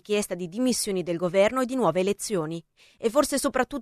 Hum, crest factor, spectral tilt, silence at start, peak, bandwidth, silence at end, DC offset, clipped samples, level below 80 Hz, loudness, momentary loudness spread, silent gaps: none; 18 dB; -4 dB/octave; 0.1 s; -8 dBFS; 14 kHz; 0 s; under 0.1%; under 0.1%; -56 dBFS; -25 LUFS; 8 LU; none